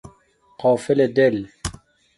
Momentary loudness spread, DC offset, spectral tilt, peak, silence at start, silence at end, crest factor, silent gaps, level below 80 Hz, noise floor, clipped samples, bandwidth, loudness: 15 LU; under 0.1%; -6 dB/octave; -4 dBFS; 0.05 s; 0.45 s; 18 dB; none; -46 dBFS; -57 dBFS; under 0.1%; 11.5 kHz; -19 LUFS